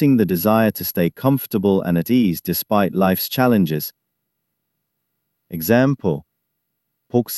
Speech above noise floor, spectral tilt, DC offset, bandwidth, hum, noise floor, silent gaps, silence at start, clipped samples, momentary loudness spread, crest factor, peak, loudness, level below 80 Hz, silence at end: 58 dB; -6.5 dB/octave; under 0.1%; 13.5 kHz; none; -75 dBFS; none; 0 s; under 0.1%; 8 LU; 18 dB; -2 dBFS; -18 LUFS; -54 dBFS; 0 s